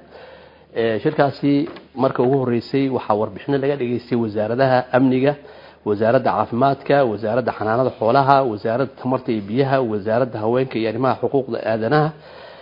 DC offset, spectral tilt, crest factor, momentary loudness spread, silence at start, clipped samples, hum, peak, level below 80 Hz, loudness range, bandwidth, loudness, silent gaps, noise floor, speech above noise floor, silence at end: under 0.1%; -10 dB/octave; 20 dB; 6 LU; 0.15 s; under 0.1%; none; 0 dBFS; -60 dBFS; 2 LU; 5.4 kHz; -19 LUFS; none; -44 dBFS; 25 dB; 0 s